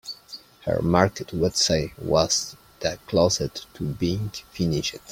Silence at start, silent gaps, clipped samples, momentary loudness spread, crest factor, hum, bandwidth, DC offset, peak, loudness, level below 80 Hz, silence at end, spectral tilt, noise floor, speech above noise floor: 0.05 s; none; under 0.1%; 13 LU; 22 dB; none; 16.5 kHz; under 0.1%; -2 dBFS; -24 LUFS; -48 dBFS; 0 s; -4 dB/octave; -45 dBFS; 21 dB